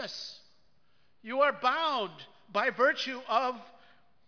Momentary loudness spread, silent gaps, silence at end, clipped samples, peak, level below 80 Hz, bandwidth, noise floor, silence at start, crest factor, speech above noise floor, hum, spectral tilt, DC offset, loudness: 17 LU; none; 0.6 s; under 0.1%; -12 dBFS; -84 dBFS; 5.4 kHz; -72 dBFS; 0 s; 20 dB; 42 dB; none; -3 dB/octave; under 0.1%; -30 LUFS